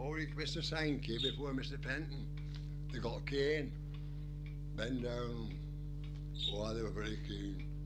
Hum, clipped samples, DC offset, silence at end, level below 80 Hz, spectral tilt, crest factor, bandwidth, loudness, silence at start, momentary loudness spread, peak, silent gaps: 50 Hz at -50 dBFS; under 0.1%; under 0.1%; 0 s; -46 dBFS; -5.5 dB/octave; 16 dB; 9.6 kHz; -41 LUFS; 0 s; 9 LU; -24 dBFS; none